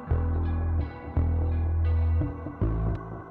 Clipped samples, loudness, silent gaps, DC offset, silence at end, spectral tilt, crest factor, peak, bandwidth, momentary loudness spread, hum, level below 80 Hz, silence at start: under 0.1%; -28 LUFS; none; under 0.1%; 0 s; -11.5 dB/octave; 12 dB; -14 dBFS; 4 kHz; 6 LU; none; -30 dBFS; 0 s